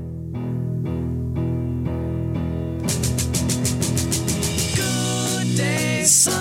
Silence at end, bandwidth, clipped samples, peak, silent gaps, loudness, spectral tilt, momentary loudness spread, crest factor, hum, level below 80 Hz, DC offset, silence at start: 0 s; 16.5 kHz; under 0.1%; -4 dBFS; none; -21 LUFS; -4 dB/octave; 8 LU; 18 dB; none; -36 dBFS; under 0.1%; 0 s